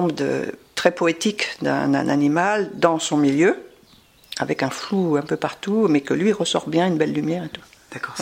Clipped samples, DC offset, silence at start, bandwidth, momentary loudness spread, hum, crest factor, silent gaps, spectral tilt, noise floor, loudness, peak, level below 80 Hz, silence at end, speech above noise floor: under 0.1%; under 0.1%; 0 s; 16 kHz; 10 LU; none; 20 dB; none; -5 dB/octave; -52 dBFS; -21 LUFS; -2 dBFS; -62 dBFS; 0 s; 32 dB